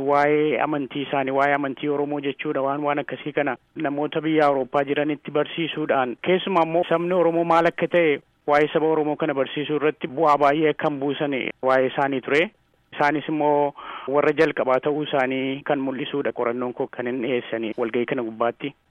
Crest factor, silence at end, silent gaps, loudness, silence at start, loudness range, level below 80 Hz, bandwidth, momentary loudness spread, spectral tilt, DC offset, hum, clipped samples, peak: 16 dB; 0.2 s; none; -22 LUFS; 0 s; 4 LU; -66 dBFS; 8.6 kHz; 7 LU; -7 dB/octave; under 0.1%; none; under 0.1%; -6 dBFS